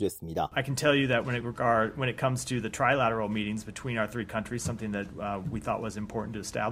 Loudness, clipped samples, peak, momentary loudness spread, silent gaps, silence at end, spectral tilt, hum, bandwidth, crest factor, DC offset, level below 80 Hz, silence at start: -30 LUFS; under 0.1%; -10 dBFS; 10 LU; none; 0 s; -5 dB/octave; none; 15.5 kHz; 20 dB; under 0.1%; -54 dBFS; 0 s